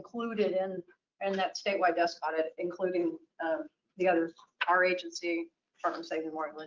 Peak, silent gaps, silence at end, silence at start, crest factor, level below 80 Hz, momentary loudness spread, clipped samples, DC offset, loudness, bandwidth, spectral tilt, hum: -14 dBFS; none; 0 s; 0 s; 18 dB; -82 dBFS; 10 LU; under 0.1%; under 0.1%; -32 LUFS; 7.6 kHz; -4.5 dB/octave; none